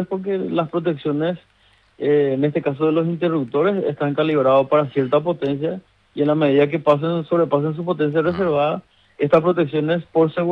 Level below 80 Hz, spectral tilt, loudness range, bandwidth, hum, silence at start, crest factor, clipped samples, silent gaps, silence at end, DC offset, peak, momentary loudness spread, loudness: -60 dBFS; -9.5 dB/octave; 2 LU; 5.6 kHz; none; 0 s; 16 dB; under 0.1%; none; 0 s; under 0.1%; -4 dBFS; 7 LU; -19 LUFS